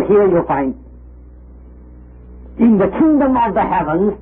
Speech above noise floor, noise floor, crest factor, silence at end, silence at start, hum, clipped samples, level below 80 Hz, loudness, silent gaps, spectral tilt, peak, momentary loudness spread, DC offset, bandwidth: 25 dB; -38 dBFS; 14 dB; 0 s; 0 s; none; under 0.1%; -38 dBFS; -14 LUFS; none; -13 dB/octave; -2 dBFS; 9 LU; under 0.1%; 3.7 kHz